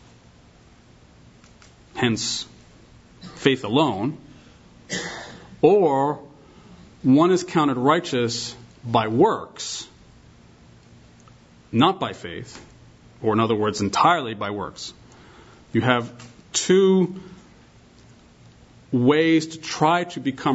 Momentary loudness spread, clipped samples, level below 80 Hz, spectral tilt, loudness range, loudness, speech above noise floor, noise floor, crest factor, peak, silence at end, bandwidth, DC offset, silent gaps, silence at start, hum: 19 LU; under 0.1%; -58 dBFS; -5 dB/octave; 6 LU; -21 LUFS; 31 dB; -51 dBFS; 22 dB; -2 dBFS; 0 s; 8 kHz; under 0.1%; none; 1.95 s; none